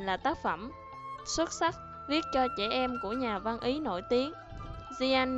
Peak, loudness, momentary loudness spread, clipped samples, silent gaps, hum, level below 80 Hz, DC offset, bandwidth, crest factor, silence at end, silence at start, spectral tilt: -14 dBFS; -32 LUFS; 14 LU; under 0.1%; none; none; -54 dBFS; under 0.1%; 8.2 kHz; 18 dB; 0 s; 0 s; -3.5 dB/octave